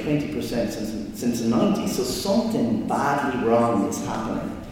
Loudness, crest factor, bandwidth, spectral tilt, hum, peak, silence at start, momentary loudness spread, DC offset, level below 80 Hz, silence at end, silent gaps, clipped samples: -24 LUFS; 14 dB; 17 kHz; -5.5 dB/octave; none; -8 dBFS; 0 s; 7 LU; under 0.1%; -46 dBFS; 0 s; none; under 0.1%